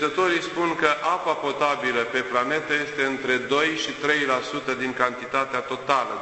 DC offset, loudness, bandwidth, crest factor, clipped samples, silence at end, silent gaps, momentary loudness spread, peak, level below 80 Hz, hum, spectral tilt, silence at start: under 0.1%; -23 LUFS; 8.4 kHz; 20 dB; under 0.1%; 0 s; none; 4 LU; -4 dBFS; -62 dBFS; none; -3.5 dB/octave; 0 s